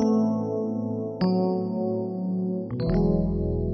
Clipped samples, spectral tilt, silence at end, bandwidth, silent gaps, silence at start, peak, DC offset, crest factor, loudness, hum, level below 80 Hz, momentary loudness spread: under 0.1%; -9.5 dB/octave; 0 s; 6.2 kHz; none; 0 s; -10 dBFS; under 0.1%; 16 dB; -26 LUFS; none; -38 dBFS; 6 LU